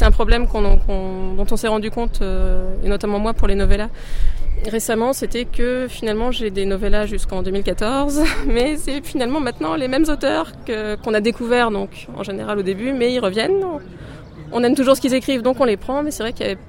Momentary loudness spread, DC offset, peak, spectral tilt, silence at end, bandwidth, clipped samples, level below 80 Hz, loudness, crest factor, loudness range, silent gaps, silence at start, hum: 9 LU; under 0.1%; 0 dBFS; -5 dB/octave; 0 s; 16 kHz; under 0.1%; -22 dBFS; -20 LUFS; 16 dB; 3 LU; none; 0 s; none